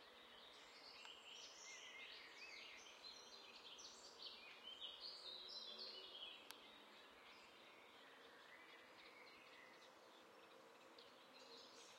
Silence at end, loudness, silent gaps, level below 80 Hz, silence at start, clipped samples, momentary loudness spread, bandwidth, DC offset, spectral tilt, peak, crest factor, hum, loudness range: 0 s; -58 LUFS; none; under -90 dBFS; 0 s; under 0.1%; 11 LU; 16 kHz; under 0.1%; 0 dB/octave; -34 dBFS; 26 dB; none; 9 LU